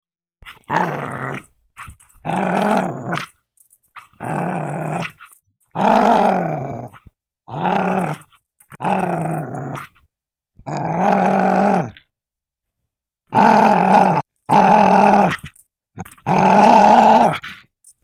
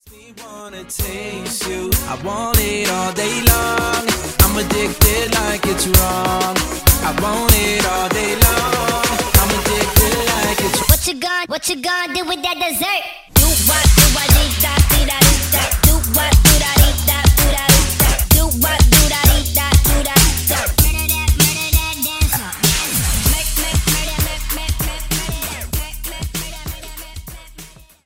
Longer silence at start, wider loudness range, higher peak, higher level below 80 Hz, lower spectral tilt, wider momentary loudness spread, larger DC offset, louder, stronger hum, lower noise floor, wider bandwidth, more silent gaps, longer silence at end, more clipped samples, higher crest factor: first, 0.45 s vs 0.05 s; first, 10 LU vs 7 LU; about the same, 0 dBFS vs 0 dBFS; second, -54 dBFS vs -20 dBFS; first, -6.5 dB/octave vs -3 dB/octave; first, 19 LU vs 12 LU; neither; about the same, -16 LUFS vs -15 LUFS; neither; first, -87 dBFS vs -39 dBFS; second, 15 kHz vs 18 kHz; neither; about the same, 0.5 s vs 0.4 s; neither; about the same, 18 dB vs 16 dB